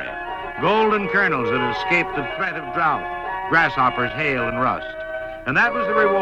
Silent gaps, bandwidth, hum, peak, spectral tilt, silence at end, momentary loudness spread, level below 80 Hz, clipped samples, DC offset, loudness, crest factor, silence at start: none; 9.6 kHz; none; -6 dBFS; -6 dB/octave; 0 s; 10 LU; -46 dBFS; under 0.1%; under 0.1%; -20 LUFS; 16 dB; 0 s